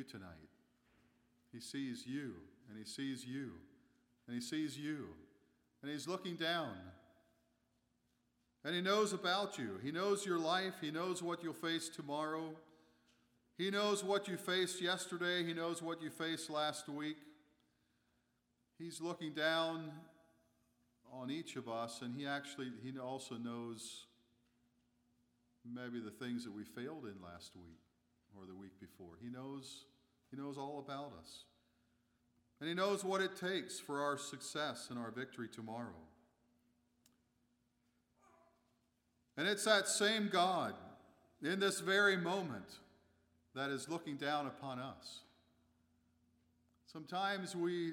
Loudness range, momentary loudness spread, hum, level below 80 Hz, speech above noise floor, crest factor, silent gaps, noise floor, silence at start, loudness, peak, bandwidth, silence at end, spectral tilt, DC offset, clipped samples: 13 LU; 20 LU; none; -84 dBFS; 41 dB; 24 dB; none; -82 dBFS; 0 s; -40 LUFS; -18 dBFS; 18.5 kHz; 0 s; -3.5 dB/octave; under 0.1%; under 0.1%